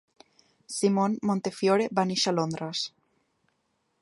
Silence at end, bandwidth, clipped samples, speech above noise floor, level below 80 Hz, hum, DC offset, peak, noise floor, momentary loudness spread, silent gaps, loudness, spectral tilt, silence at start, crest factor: 1.15 s; 11.5 kHz; under 0.1%; 48 dB; -72 dBFS; none; under 0.1%; -8 dBFS; -75 dBFS; 8 LU; none; -27 LUFS; -4.5 dB/octave; 0.7 s; 20 dB